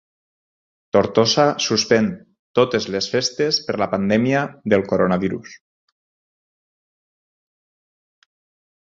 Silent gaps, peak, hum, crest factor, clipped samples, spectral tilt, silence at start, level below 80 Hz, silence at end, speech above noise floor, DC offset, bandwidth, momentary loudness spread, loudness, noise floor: 2.39-2.54 s; -2 dBFS; none; 20 dB; under 0.1%; -4.5 dB/octave; 0.95 s; -54 dBFS; 3.3 s; over 71 dB; under 0.1%; 7.8 kHz; 7 LU; -19 LUFS; under -90 dBFS